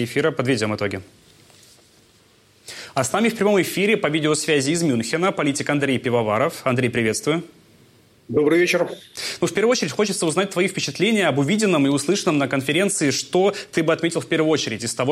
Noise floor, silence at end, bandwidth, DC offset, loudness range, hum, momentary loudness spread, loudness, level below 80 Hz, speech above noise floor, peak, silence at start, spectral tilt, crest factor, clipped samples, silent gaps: -55 dBFS; 0 s; 15.5 kHz; under 0.1%; 3 LU; none; 6 LU; -20 LUFS; -62 dBFS; 35 dB; -6 dBFS; 0 s; -4.5 dB/octave; 14 dB; under 0.1%; none